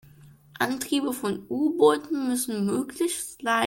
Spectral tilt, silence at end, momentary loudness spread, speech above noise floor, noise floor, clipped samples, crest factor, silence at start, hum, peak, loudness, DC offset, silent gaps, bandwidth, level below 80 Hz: -4 dB/octave; 0 s; 9 LU; 27 dB; -52 dBFS; under 0.1%; 20 dB; 0.25 s; none; -6 dBFS; -26 LUFS; under 0.1%; none; 17 kHz; -64 dBFS